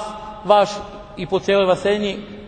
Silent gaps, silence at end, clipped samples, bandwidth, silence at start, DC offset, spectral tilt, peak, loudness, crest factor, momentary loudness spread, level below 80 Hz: none; 0 s; under 0.1%; 9.4 kHz; 0 s; under 0.1%; -5 dB/octave; 0 dBFS; -18 LUFS; 20 dB; 15 LU; -46 dBFS